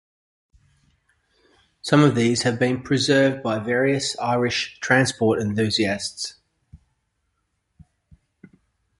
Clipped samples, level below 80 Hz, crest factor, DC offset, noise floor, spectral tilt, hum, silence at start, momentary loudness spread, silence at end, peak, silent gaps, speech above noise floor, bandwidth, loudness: under 0.1%; -56 dBFS; 20 dB; under 0.1%; -73 dBFS; -5 dB/octave; none; 1.85 s; 9 LU; 2.25 s; -2 dBFS; none; 53 dB; 11.5 kHz; -21 LUFS